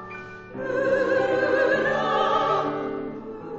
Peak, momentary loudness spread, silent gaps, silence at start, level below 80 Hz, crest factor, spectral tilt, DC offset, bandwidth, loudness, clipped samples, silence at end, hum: -10 dBFS; 15 LU; none; 0 s; -58 dBFS; 14 dB; -5.5 dB/octave; under 0.1%; 7.8 kHz; -23 LUFS; under 0.1%; 0 s; none